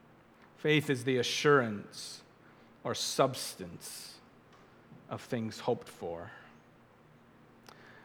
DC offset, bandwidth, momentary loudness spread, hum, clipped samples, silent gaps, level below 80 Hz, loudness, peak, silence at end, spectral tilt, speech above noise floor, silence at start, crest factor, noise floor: under 0.1%; 19 kHz; 18 LU; none; under 0.1%; none; -74 dBFS; -33 LUFS; -12 dBFS; 0.05 s; -4 dB/octave; 28 dB; 0.6 s; 24 dB; -61 dBFS